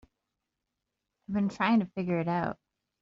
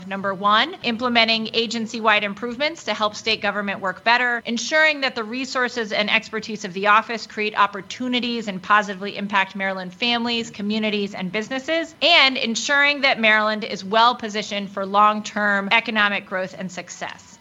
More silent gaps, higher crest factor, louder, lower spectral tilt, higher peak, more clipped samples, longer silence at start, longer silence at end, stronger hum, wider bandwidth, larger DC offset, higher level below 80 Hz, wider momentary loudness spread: neither; about the same, 18 dB vs 20 dB; second, -30 LUFS vs -20 LUFS; first, -6 dB/octave vs -3 dB/octave; second, -14 dBFS vs -2 dBFS; neither; first, 1.3 s vs 0 s; first, 0.5 s vs 0.2 s; neither; second, 7.4 kHz vs 10.5 kHz; neither; about the same, -66 dBFS vs -66 dBFS; about the same, 9 LU vs 11 LU